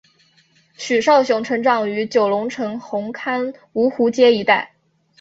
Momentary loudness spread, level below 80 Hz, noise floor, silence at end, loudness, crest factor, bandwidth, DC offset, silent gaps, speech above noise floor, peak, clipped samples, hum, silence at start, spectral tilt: 11 LU; -64 dBFS; -57 dBFS; 0.55 s; -18 LUFS; 18 dB; 7.8 kHz; under 0.1%; none; 39 dB; -2 dBFS; under 0.1%; none; 0.8 s; -4.5 dB/octave